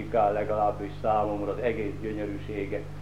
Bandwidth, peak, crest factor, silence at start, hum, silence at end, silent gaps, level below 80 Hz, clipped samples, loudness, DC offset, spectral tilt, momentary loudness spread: 12.5 kHz; -12 dBFS; 16 dB; 0 s; 50 Hz at -40 dBFS; 0 s; none; -46 dBFS; under 0.1%; -29 LUFS; 0.7%; -8 dB/octave; 8 LU